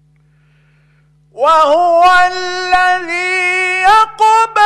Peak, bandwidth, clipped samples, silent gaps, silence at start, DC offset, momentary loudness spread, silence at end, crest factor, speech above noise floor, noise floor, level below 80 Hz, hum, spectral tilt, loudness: -2 dBFS; 12 kHz; under 0.1%; none; 1.35 s; under 0.1%; 6 LU; 0 s; 10 dB; 40 dB; -51 dBFS; -44 dBFS; none; -1.5 dB/octave; -10 LUFS